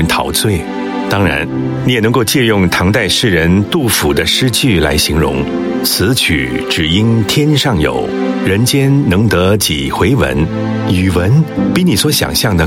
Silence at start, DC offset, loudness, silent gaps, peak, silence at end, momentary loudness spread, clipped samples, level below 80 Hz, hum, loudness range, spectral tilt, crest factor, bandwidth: 0 s; under 0.1%; -12 LUFS; none; 0 dBFS; 0 s; 5 LU; under 0.1%; -30 dBFS; none; 1 LU; -4.5 dB/octave; 12 dB; 16.5 kHz